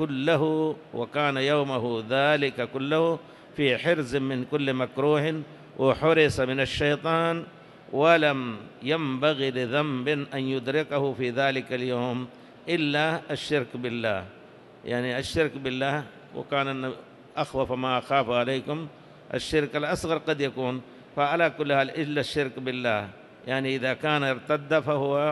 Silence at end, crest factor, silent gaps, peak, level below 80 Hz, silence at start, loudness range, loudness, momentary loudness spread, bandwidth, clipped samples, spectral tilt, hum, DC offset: 0 s; 18 dB; none; -8 dBFS; -56 dBFS; 0 s; 4 LU; -26 LUFS; 11 LU; 12.5 kHz; under 0.1%; -6 dB/octave; none; under 0.1%